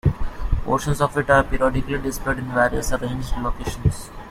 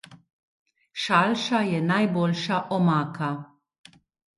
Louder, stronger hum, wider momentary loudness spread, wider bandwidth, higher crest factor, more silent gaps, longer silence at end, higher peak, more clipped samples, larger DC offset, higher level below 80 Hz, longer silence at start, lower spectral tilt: about the same, -22 LUFS vs -24 LUFS; neither; about the same, 10 LU vs 10 LU; first, 16 kHz vs 11.5 kHz; about the same, 18 dB vs 20 dB; second, none vs 0.33-0.66 s; second, 0 s vs 0.9 s; about the same, -4 dBFS vs -6 dBFS; neither; neither; first, -28 dBFS vs -70 dBFS; about the same, 0.05 s vs 0.1 s; about the same, -6 dB/octave vs -6 dB/octave